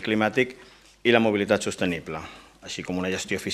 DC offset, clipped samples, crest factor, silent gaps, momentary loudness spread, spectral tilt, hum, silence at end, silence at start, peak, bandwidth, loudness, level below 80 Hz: under 0.1%; under 0.1%; 24 dB; none; 15 LU; -4.5 dB/octave; none; 0 s; 0 s; -2 dBFS; 15 kHz; -25 LUFS; -60 dBFS